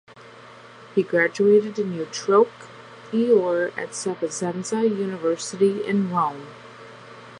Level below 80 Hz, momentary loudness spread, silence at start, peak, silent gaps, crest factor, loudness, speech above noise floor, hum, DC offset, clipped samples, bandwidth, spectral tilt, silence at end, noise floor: -74 dBFS; 23 LU; 0.15 s; -6 dBFS; none; 18 dB; -22 LUFS; 23 dB; none; under 0.1%; under 0.1%; 11 kHz; -5 dB/octave; 0 s; -45 dBFS